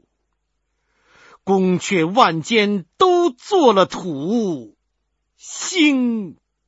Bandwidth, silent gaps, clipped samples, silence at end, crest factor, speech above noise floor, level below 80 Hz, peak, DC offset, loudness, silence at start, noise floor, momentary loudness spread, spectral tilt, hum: 8 kHz; none; under 0.1%; 0.35 s; 20 dB; 55 dB; -62 dBFS; 0 dBFS; under 0.1%; -17 LUFS; 1.45 s; -72 dBFS; 12 LU; -4.5 dB/octave; none